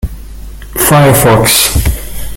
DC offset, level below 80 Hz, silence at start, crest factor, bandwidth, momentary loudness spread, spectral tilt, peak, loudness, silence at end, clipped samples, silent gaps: under 0.1%; -20 dBFS; 0.05 s; 10 dB; over 20 kHz; 15 LU; -4 dB/octave; 0 dBFS; -7 LUFS; 0 s; 0.2%; none